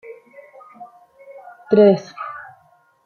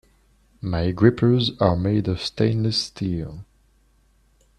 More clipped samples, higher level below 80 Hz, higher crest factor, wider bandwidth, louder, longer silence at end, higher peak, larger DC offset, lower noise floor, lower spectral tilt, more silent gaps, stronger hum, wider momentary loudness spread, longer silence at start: neither; second, -68 dBFS vs -46 dBFS; about the same, 20 dB vs 22 dB; second, 6.8 kHz vs 10.5 kHz; first, -15 LUFS vs -22 LUFS; second, 0.65 s vs 1.15 s; about the same, -2 dBFS vs -2 dBFS; neither; second, -56 dBFS vs -60 dBFS; about the same, -8 dB/octave vs -7 dB/octave; neither; neither; first, 28 LU vs 12 LU; second, 0.1 s vs 0.65 s